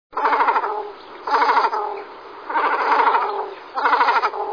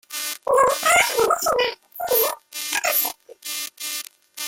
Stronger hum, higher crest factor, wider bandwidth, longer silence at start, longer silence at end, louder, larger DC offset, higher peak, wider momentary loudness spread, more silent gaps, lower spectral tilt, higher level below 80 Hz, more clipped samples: neither; about the same, 16 dB vs 18 dB; second, 5.4 kHz vs 17 kHz; about the same, 0.15 s vs 0.1 s; about the same, 0 s vs 0 s; about the same, -19 LUFS vs -21 LUFS; neither; about the same, -4 dBFS vs -4 dBFS; first, 16 LU vs 13 LU; neither; first, -2.5 dB/octave vs 0 dB/octave; second, -68 dBFS vs -58 dBFS; neither